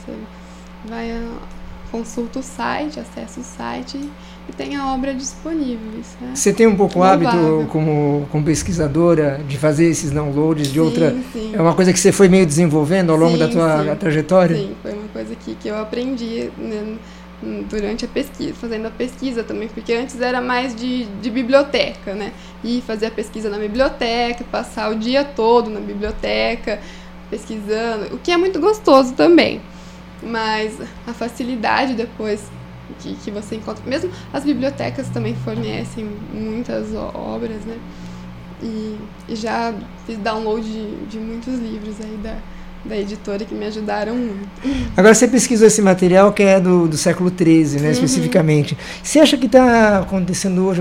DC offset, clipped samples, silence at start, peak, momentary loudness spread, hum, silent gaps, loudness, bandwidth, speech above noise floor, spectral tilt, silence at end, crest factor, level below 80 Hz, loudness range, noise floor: under 0.1%; under 0.1%; 0 s; 0 dBFS; 19 LU; none; none; -17 LUFS; 16 kHz; 20 dB; -5.5 dB/octave; 0 s; 18 dB; -40 dBFS; 12 LU; -37 dBFS